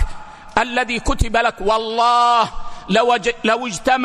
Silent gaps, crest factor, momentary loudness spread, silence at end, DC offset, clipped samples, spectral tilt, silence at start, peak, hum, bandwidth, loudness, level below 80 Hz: none; 14 dB; 8 LU; 0 s; under 0.1%; under 0.1%; -4 dB/octave; 0 s; -2 dBFS; none; 13 kHz; -17 LUFS; -30 dBFS